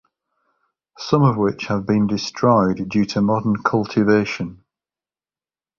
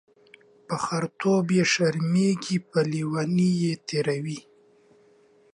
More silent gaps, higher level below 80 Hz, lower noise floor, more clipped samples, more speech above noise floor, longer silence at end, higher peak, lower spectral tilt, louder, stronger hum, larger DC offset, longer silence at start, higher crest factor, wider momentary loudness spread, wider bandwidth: neither; first, -52 dBFS vs -68 dBFS; first, under -90 dBFS vs -58 dBFS; neither; first, over 72 dB vs 34 dB; about the same, 1.25 s vs 1.15 s; first, -2 dBFS vs -10 dBFS; first, -7 dB/octave vs -5.5 dB/octave; first, -19 LUFS vs -25 LUFS; neither; neither; first, 1 s vs 0.7 s; about the same, 18 dB vs 16 dB; about the same, 8 LU vs 9 LU; second, 7.2 kHz vs 11 kHz